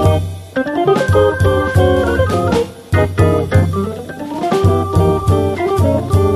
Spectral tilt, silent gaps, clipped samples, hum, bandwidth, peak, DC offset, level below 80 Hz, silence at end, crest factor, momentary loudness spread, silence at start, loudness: -7.5 dB/octave; none; under 0.1%; none; 14 kHz; 0 dBFS; under 0.1%; -24 dBFS; 0 s; 14 dB; 8 LU; 0 s; -14 LUFS